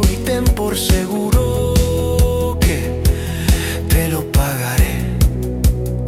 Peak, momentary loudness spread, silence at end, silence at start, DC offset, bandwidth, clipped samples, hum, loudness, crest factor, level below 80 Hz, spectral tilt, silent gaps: -2 dBFS; 2 LU; 0 s; 0 s; under 0.1%; 16.5 kHz; under 0.1%; none; -17 LUFS; 12 dB; -20 dBFS; -5.5 dB/octave; none